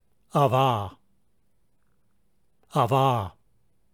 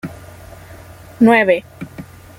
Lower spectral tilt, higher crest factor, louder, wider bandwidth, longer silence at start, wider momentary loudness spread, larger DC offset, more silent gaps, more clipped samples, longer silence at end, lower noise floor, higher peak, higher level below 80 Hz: about the same, -7 dB/octave vs -6.5 dB/octave; about the same, 20 dB vs 16 dB; second, -24 LUFS vs -13 LUFS; first, 19.5 kHz vs 16 kHz; first, 0.35 s vs 0.05 s; second, 12 LU vs 24 LU; neither; neither; neither; first, 0.65 s vs 0.35 s; first, -72 dBFS vs -38 dBFS; second, -8 dBFS vs -2 dBFS; second, -64 dBFS vs -48 dBFS